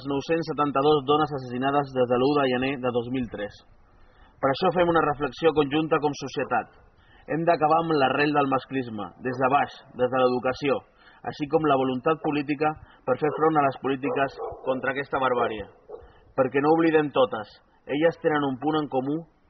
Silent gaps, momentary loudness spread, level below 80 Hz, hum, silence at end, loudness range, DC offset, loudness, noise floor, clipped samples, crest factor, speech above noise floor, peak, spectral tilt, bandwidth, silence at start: none; 10 LU; -58 dBFS; none; 0.25 s; 2 LU; under 0.1%; -25 LUFS; -54 dBFS; under 0.1%; 18 dB; 29 dB; -8 dBFS; -4.5 dB/octave; 6.2 kHz; 0 s